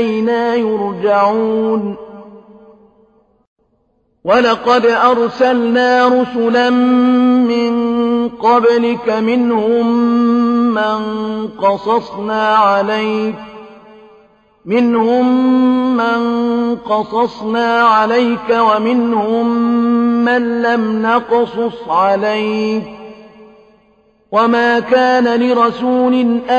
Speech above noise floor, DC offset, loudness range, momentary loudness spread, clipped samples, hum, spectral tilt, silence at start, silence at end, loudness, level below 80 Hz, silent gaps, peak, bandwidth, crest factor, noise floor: 47 dB; under 0.1%; 5 LU; 6 LU; under 0.1%; none; -6 dB/octave; 0 s; 0 s; -13 LUFS; -54 dBFS; 3.47-3.56 s; 0 dBFS; 7.2 kHz; 14 dB; -60 dBFS